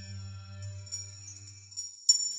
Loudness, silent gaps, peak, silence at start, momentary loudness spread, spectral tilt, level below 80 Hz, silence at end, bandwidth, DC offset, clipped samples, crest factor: -32 LUFS; none; -8 dBFS; 0 s; 20 LU; 0 dB/octave; -72 dBFS; 0 s; 14.5 kHz; under 0.1%; under 0.1%; 26 dB